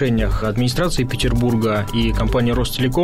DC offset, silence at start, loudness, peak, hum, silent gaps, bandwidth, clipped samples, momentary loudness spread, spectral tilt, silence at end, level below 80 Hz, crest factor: 0.7%; 0 s; -19 LUFS; -8 dBFS; none; none; 16 kHz; under 0.1%; 2 LU; -6 dB/octave; 0 s; -26 dBFS; 10 dB